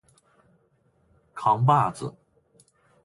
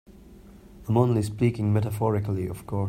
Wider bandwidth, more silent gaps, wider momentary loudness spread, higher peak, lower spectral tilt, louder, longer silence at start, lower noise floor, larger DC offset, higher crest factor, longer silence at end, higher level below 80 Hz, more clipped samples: second, 11.5 kHz vs 14.5 kHz; neither; first, 18 LU vs 8 LU; about the same, -8 dBFS vs -6 dBFS; second, -7 dB/octave vs -8.5 dB/octave; about the same, -23 LUFS vs -25 LUFS; first, 1.35 s vs 0.1 s; first, -66 dBFS vs -48 dBFS; neither; about the same, 20 dB vs 18 dB; first, 0.95 s vs 0 s; second, -64 dBFS vs -52 dBFS; neither